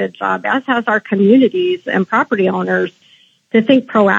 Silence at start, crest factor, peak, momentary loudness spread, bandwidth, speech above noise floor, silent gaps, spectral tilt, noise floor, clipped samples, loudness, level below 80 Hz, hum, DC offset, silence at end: 0 s; 14 dB; 0 dBFS; 7 LU; 7.6 kHz; 37 dB; none; -7.5 dB/octave; -51 dBFS; under 0.1%; -14 LUFS; -72 dBFS; none; under 0.1%; 0 s